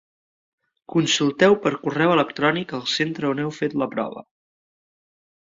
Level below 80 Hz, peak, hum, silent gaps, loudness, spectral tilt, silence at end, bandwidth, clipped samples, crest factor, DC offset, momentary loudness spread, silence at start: -64 dBFS; -2 dBFS; none; none; -21 LUFS; -4.5 dB/octave; 1.4 s; 7.8 kHz; under 0.1%; 20 dB; under 0.1%; 9 LU; 0.9 s